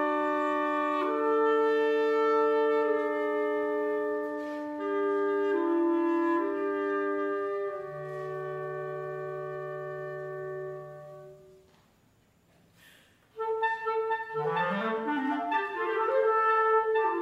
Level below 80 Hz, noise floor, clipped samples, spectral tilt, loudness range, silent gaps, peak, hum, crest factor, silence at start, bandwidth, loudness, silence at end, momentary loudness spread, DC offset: -76 dBFS; -65 dBFS; under 0.1%; -7 dB/octave; 13 LU; none; -14 dBFS; none; 14 dB; 0 s; 7.6 kHz; -29 LUFS; 0 s; 13 LU; under 0.1%